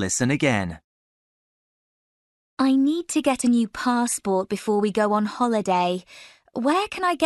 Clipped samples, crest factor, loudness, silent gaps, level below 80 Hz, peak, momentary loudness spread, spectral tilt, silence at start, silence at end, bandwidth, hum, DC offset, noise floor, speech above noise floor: under 0.1%; 18 dB; -22 LUFS; 0.84-2.57 s; -58 dBFS; -6 dBFS; 6 LU; -4.5 dB/octave; 0 s; 0 s; 12 kHz; none; under 0.1%; under -90 dBFS; over 68 dB